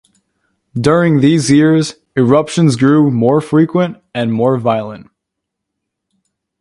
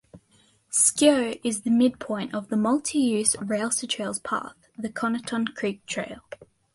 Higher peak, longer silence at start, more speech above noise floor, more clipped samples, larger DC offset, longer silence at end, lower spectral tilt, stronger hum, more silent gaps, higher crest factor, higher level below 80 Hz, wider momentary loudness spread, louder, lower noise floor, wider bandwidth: first, 0 dBFS vs -6 dBFS; first, 0.75 s vs 0.15 s; first, 65 dB vs 37 dB; neither; neither; first, 1.6 s vs 0.3 s; first, -6.5 dB/octave vs -3 dB/octave; neither; neither; second, 14 dB vs 20 dB; first, -50 dBFS vs -64 dBFS; second, 9 LU vs 15 LU; first, -12 LUFS vs -24 LUFS; first, -77 dBFS vs -62 dBFS; about the same, 11.5 kHz vs 12 kHz